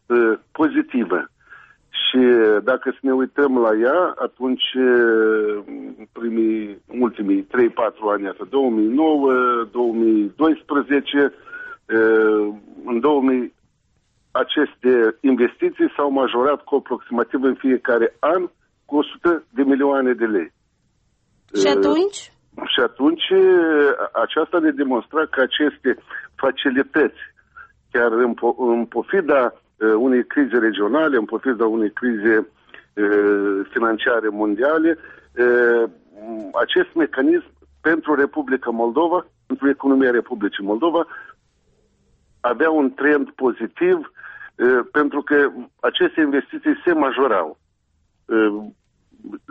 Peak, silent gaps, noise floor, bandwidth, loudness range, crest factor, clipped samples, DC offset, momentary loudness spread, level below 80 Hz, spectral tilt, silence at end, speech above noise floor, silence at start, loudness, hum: -6 dBFS; none; -65 dBFS; 8.2 kHz; 3 LU; 14 dB; under 0.1%; under 0.1%; 9 LU; -62 dBFS; -5 dB/octave; 0.15 s; 47 dB; 0.1 s; -19 LUFS; none